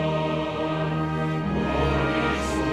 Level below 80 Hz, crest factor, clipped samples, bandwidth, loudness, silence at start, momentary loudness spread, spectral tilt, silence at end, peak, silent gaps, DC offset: -36 dBFS; 14 dB; under 0.1%; 12 kHz; -25 LUFS; 0 s; 3 LU; -6.5 dB/octave; 0 s; -10 dBFS; none; under 0.1%